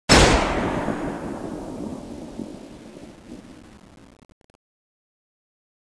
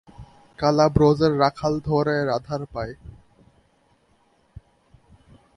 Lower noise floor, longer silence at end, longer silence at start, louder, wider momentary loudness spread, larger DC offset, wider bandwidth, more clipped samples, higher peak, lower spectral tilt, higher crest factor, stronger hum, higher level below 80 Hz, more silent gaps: second, -42 dBFS vs -62 dBFS; second, 2.3 s vs 2.45 s; about the same, 0.1 s vs 0.2 s; about the same, -22 LUFS vs -21 LUFS; first, 26 LU vs 15 LU; neither; about the same, 11 kHz vs 10.5 kHz; neither; first, 0 dBFS vs -4 dBFS; second, -4 dB/octave vs -7 dB/octave; about the same, 24 dB vs 22 dB; neither; first, -34 dBFS vs -46 dBFS; neither